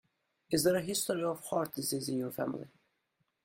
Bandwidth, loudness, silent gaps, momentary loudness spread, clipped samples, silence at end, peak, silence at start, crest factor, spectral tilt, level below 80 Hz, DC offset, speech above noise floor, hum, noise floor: 16.5 kHz; -33 LUFS; none; 9 LU; under 0.1%; 0.75 s; -16 dBFS; 0.5 s; 20 dB; -4 dB/octave; -70 dBFS; under 0.1%; 47 dB; none; -80 dBFS